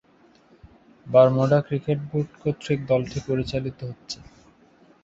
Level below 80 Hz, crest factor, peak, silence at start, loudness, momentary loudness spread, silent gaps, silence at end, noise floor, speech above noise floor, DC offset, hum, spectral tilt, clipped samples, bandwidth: -52 dBFS; 22 dB; -4 dBFS; 1.05 s; -23 LUFS; 18 LU; none; 0.9 s; -57 dBFS; 34 dB; under 0.1%; none; -7.5 dB/octave; under 0.1%; 8 kHz